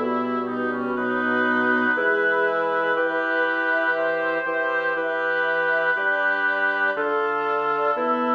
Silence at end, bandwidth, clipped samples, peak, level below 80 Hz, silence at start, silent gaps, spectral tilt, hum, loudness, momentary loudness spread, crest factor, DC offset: 0 s; 6.8 kHz; under 0.1%; -10 dBFS; -70 dBFS; 0 s; none; -6 dB/octave; none; -22 LUFS; 4 LU; 14 dB; under 0.1%